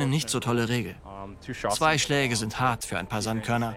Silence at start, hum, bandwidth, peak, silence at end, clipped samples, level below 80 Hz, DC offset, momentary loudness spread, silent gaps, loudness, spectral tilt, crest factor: 0 s; none; 17 kHz; -10 dBFS; 0 s; under 0.1%; -50 dBFS; under 0.1%; 15 LU; none; -26 LUFS; -4 dB/octave; 18 dB